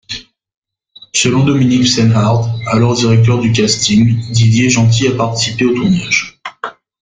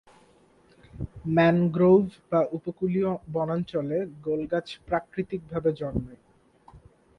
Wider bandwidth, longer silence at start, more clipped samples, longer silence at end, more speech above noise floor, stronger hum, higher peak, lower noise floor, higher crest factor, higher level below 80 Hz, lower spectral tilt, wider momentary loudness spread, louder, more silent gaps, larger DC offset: first, 9.4 kHz vs 6.2 kHz; second, 0.1 s vs 0.95 s; neither; about the same, 0.3 s vs 0.4 s; about the same, 32 dB vs 34 dB; neither; first, 0 dBFS vs -8 dBFS; second, -43 dBFS vs -59 dBFS; second, 12 dB vs 18 dB; first, -42 dBFS vs -52 dBFS; second, -5 dB/octave vs -9 dB/octave; first, 15 LU vs 12 LU; first, -12 LUFS vs -26 LUFS; first, 0.57-0.62 s vs none; neither